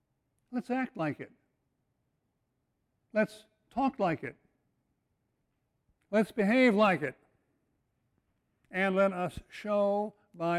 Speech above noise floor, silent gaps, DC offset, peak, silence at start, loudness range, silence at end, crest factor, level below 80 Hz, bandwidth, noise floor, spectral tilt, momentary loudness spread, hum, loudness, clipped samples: 50 dB; none; under 0.1%; -14 dBFS; 0.5 s; 7 LU; 0 s; 20 dB; -66 dBFS; 13 kHz; -80 dBFS; -7 dB/octave; 15 LU; none; -31 LUFS; under 0.1%